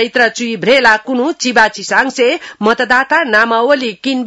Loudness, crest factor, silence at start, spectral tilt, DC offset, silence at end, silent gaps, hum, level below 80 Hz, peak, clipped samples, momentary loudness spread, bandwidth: -12 LUFS; 12 dB; 0 s; -3 dB/octave; under 0.1%; 0 s; none; none; -52 dBFS; 0 dBFS; 0.3%; 6 LU; 12 kHz